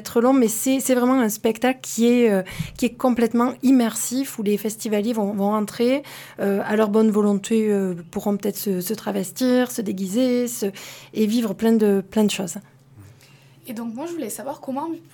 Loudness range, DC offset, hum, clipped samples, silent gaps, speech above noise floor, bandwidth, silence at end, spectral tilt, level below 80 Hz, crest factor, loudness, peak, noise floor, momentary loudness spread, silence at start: 4 LU; under 0.1%; none; under 0.1%; none; 29 dB; 19 kHz; 0.15 s; -5 dB/octave; -58 dBFS; 16 dB; -21 LUFS; -6 dBFS; -50 dBFS; 11 LU; 0 s